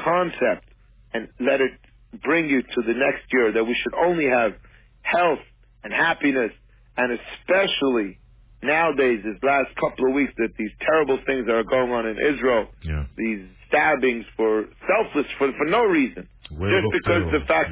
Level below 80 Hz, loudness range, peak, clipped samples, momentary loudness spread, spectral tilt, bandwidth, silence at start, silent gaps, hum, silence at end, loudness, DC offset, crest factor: -44 dBFS; 2 LU; -6 dBFS; under 0.1%; 10 LU; -9 dB/octave; 4 kHz; 0 s; none; none; 0 s; -22 LUFS; under 0.1%; 16 dB